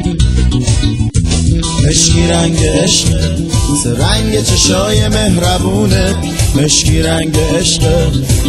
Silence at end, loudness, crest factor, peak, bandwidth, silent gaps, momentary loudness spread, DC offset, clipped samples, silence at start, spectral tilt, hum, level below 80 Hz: 0 s; -11 LUFS; 10 dB; 0 dBFS; 15.5 kHz; none; 4 LU; under 0.1%; under 0.1%; 0 s; -4.5 dB/octave; none; -18 dBFS